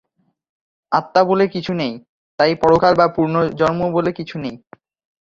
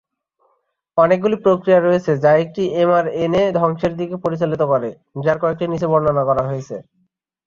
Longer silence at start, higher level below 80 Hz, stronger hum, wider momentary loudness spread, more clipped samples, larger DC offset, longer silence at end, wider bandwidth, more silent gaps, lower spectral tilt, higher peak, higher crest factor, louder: about the same, 0.9 s vs 0.95 s; about the same, -52 dBFS vs -52 dBFS; neither; first, 13 LU vs 9 LU; neither; neither; about the same, 0.65 s vs 0.65 s; about the same, 7.4 kHz vs 7.2 kHz; first, 2.09-2.38 s vs none; about the same, -7 dB/octave vs -8 dB/octave; about the same, 0 dBFS vs -2 dBFS; about the same, 18 dB vs 16 dB; about the same, -17 LUFS vs -17 LUFS